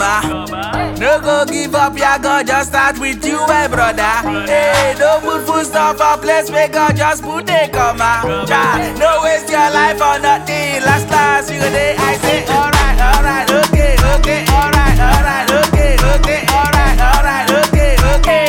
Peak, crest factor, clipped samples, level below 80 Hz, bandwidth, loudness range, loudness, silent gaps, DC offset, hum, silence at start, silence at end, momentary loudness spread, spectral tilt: 0 dBFS; 12 dB; under 0.1%; -18 dBFS; 17.5 kHz; 1 LU; -12 LUFS; none; under 0.1%; none; 0 s; 0 s; 4 LU; -4 dB/octave